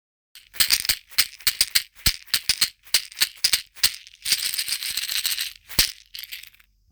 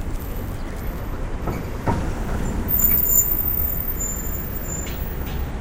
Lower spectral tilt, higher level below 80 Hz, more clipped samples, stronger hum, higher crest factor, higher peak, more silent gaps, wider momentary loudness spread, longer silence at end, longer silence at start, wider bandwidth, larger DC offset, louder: second, 1.5 dB/octave vs -4.5 dB/octave; second, -46 dBFS vs -28 dBFS; neither; neither; first, 24 dB vs 18 dB; first, 0 dBFS vs -4 dBFS; neither; second, 12 LU vs 16 LU; first, 0.5 s vs 0 s; first, 0.35 s vs 0 s; first, over 20 kHz vs 16.5 kHz; neither; about the same, -21 LUFS vs -22 LUFS